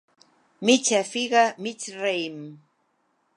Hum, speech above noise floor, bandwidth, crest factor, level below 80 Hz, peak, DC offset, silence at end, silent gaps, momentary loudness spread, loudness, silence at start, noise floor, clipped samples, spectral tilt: none; 46 dB; 11.5 kHz; 22 dB; -82 dBFS; -4 dBFS; under 0.1%; 0.8 s; none; 14 LU; -23 LUFS; 0.6 s; -70 dBFS; under 0.1%; -2.5 dB/octave